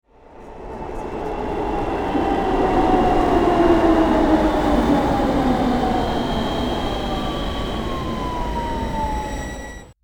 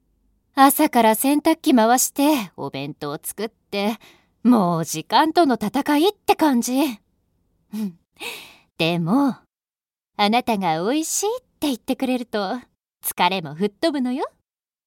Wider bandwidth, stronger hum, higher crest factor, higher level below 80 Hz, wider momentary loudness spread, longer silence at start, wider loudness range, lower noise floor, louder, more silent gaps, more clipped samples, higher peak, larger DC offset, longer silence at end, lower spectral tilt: first, 19.5 kHz vs 17 kHz; neither; about the same, 16 dB vs 20 dB; first, -30 dBFS vs -64 dBFS; about the same, 13 LU vs 15 LU; second, 0.3 s vs 0.55 s; about the same, 7 LU vs 6 LU; second, -41 dBFS vs under -90 dBFS; about the same, -20 LUFS vs -20 LUFS; neither; neither; second, -4 dBFS vs 0 dBFS; neither; second, 0.1 s vs 0.6 s; first, -6.5 dB/octave vs -4 dB/octave